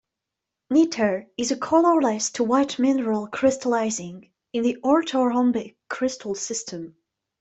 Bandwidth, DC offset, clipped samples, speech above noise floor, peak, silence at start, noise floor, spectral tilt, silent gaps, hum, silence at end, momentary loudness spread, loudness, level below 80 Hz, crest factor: 8.4 kHz; under 0.1%; under 0.1%; 63 dB; -6 dBFS; 0.7 s; -85 dBFS; -4 dB/octave; none; none; 0.5 s; 11 LU; -23 LUFS; -66 dBFS; 18 dB